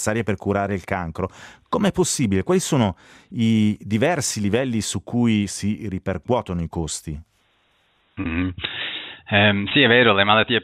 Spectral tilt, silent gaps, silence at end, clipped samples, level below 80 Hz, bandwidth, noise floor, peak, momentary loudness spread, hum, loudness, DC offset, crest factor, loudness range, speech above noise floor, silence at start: -4.5 dB/octave; none; 0 s; under 0.1%; -50 dBFS; 15.5 kHz; -63 dBFS; -2 dBFS; 14 LU; none; -21 LUFS; under 0.1%; 20 dB; 7 LU; 42 dB; 0 s